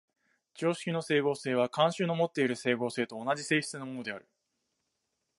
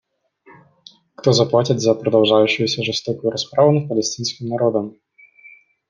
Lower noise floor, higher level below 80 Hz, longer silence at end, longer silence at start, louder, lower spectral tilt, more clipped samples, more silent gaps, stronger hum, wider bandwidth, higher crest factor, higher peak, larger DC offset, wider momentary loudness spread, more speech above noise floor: first, -82 dBFS vs -52 dBFS; second, -82 dBFS vs -64 dBFS; first, 1.2 s vs 1 s; second, 0.55 s vs 1.25 s; second, -31 LUFS vs -18 LUFS; about the same, -5 dB/octave vs -5 dB/octave; neither; neither; neither; first, 11.5 kHz vs 9.8 kHz; about the same, 20 dB vs 18 dB; second, -12 dBFS vs -2 dBFS; neither; about the same, 10 LU vs 8 LU; first, 52 dB vs 35 dB